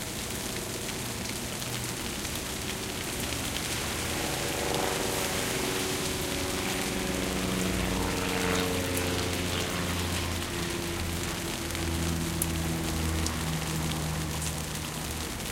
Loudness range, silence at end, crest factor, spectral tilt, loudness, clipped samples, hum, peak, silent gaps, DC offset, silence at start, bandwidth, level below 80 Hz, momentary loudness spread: 3 LU; 0 s; 22 dB; -3.5 dB/octave; -30 LUFS; under 0.1%; none; -10 dBFS; none; under 0.1%; 0 s; 17 kHz; -42 dBFS; 4 LU